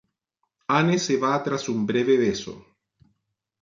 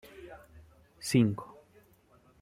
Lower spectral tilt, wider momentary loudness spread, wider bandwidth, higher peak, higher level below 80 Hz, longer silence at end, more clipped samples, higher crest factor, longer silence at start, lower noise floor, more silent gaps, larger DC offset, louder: about the same, -5 dB/octave vs -6 dB/octave; second, 11 LU vs 24 LU; second, 7.6 kHz vs 16 kHz; first, -6 dBFS vs -12 dBFS; about the same, -62 dBFS vs -64 dBFS; about the same, 1 s vs 0.95 s; neither; about the same, 18 dB vs 22 dB; first, 0.7 s vs 0.2 s; first, -78 dBFS vs -63 dBFS; neither; neither; first, -23 LUFS vs -30 LUFS